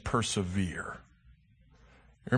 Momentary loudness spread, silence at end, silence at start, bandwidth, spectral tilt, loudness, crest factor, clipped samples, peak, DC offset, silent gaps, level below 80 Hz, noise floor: 19 LU; 0 s; 0.05 s; 9.8 kHz; -5 dB/octave; -33 LUFS; 22 dB; under 0.1%; -12 dBFS; under 0.1%; none; -52 dBFS; -62 dBFS